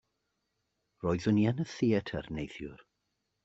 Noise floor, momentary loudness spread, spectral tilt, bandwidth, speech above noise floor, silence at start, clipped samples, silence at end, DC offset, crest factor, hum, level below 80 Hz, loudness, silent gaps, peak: -82 dBFS; 14 LU; -7.5 dB/octave; 8 kHz; 51 dB; 1.05 s; under 0.1%; 0.7 s; under 0.1%; 18 dB; none; -60 dBFS; -32 LUFS; none; -16 dBFS